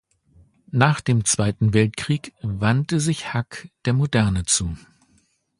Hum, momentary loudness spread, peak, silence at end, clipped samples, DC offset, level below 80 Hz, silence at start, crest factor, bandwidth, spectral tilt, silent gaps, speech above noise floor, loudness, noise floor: none; 9 LU; 0 dBFS; 0.8 s; under 0.1%; under 0.1%; -42 dBFS; 0.75 s; 22 dB; 11.5 kHz; -4.5 dB/octave; none; 42 dB; -21 LUFS; -63 dBFS